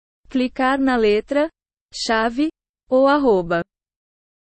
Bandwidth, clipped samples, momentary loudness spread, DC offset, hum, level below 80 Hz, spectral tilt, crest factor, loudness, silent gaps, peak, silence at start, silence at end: 8.4 kHz; under 0.1%; 10 LU; under 0.1%; none; -48 dBFS; -5 dB/octave; 14 dB; -19 LUFS; 1.81-1.89 s, 2.69-2.74 s; -6 dBFS; 0.3 s; 0.8 s